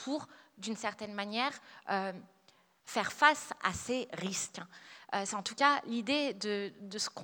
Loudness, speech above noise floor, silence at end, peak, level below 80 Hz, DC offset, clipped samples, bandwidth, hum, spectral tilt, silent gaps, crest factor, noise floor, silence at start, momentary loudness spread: -34 LUFS; 32 dB; 0 s; -10 dBFS; -70 dBFS; under 0.1%; under 0.1%; 20 kHz; none; -2.5 dB/octave; none; 26 dB; -67 dBFS; 0 s; 16 LU